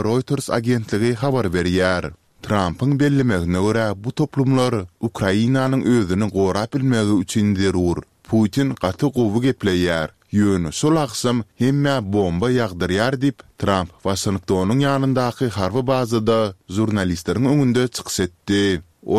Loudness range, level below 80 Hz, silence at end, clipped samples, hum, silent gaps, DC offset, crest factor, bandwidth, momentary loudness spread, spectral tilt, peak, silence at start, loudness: 1 LU; -46 dBFS; 0 s; under 0.1%; none; none; 0.2%; 18 dB; 15 kHz; 5 LU; -6 dB/octave; -2 dBFS; 0 s; -20 LUFS